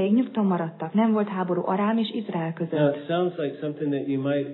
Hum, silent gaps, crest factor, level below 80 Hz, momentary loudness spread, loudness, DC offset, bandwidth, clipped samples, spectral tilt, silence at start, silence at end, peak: none; none; 14 dB; -84 dBFS; 6 LU; -25 LUFS; under 0.1%; 4.3 kHz; under 0.1%; -11 dB/octave; 0 s; 0 s; -10 dBFS